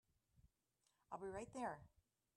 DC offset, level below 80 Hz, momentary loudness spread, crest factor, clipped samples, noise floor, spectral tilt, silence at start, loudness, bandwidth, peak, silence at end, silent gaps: under 0.1%; -78 dBFS; 8 LU; 20 dB; under 0.1%; -86 dBFS; -5.5 dB/octave; 0.45 s; -52 LUFS; 12 kHz; -34 dBFS; 0.5 s; none